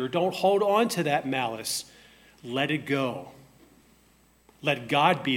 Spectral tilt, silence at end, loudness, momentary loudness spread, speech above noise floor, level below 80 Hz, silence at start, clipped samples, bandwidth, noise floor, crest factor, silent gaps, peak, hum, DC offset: -4.5 dB/octave; 0 s; -26 LUFS; 10 LU; 35 dB; -68 dBFS; 0 s; under 0.1%; 16.5 kHz; -61 dBFS; 20 dB; none; -8 dBFS; none; under 0.1%